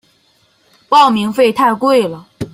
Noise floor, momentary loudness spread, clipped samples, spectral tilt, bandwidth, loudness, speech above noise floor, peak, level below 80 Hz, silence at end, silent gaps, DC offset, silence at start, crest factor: -55 dBFS; 9 LU; under 0.1%; -5 dB/octave; 16 kHz; -12 LUFS; 44 dB; 0 dBFS; -54 dBFS; 0.05 s; none; under 0.1%; 0.9 s; 14 dB